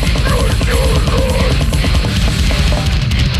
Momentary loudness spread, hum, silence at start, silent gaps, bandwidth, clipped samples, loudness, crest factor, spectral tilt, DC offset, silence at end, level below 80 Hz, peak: 1 LU; none; 0 s; none; 13.5 kHz; under 0.1%; -14 LUFS; 10 dB; -5 dB/octave; under 0.1%; 0 s; -16 dBFS; -4 dBFS